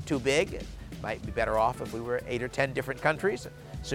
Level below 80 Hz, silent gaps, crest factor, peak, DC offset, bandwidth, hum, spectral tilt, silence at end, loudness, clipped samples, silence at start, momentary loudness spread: -46 dBFS; none; 20 dB; -10 dBFS; under 0.1%; 17 kHz; none; -5 dB/octave; 0 s; -30 LUFS; under 0.1%; 0 s; 13 LU